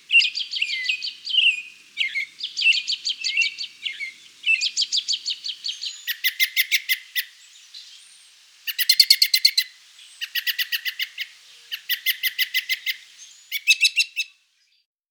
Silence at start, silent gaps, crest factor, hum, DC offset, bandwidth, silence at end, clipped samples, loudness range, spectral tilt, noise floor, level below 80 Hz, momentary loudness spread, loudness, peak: 0.1 s; none; 24 dB; none; under 0.1%; over 20 kHz; 0.85 s; under 0.1%; 5 LU; 6.5 dB/octave; -64 dBFS; under -90 dBFS; 16 LU; -21 LUFS; 0 dBFS